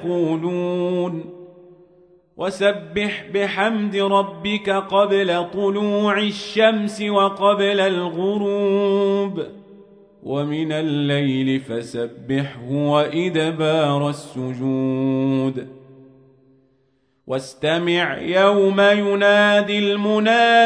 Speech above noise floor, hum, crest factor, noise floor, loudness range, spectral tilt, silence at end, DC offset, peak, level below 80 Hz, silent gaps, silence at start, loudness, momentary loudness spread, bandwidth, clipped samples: 45 dB; none; 18 dB; -64 dBFS; 6 LU; -6 dB/octave; 0 s; under 0.1%; -2 dBFS; -62 dBFS; none; 0 s; -19 LUFS; 12 LU; 10.5 kHz; under 0.1%